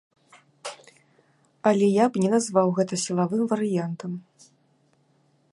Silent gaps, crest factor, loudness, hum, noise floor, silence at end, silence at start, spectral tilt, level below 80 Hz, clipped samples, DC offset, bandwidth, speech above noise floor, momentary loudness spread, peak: none; 20 dB; -24 LUFS; none; -65 dBFS; 1.35 s; 0.65 s; -6 dB/octave; -74 dBFS; under 0.1%; under 0.1%; 11.5 kHz; 42 dB; 18 LU; -6 dBFS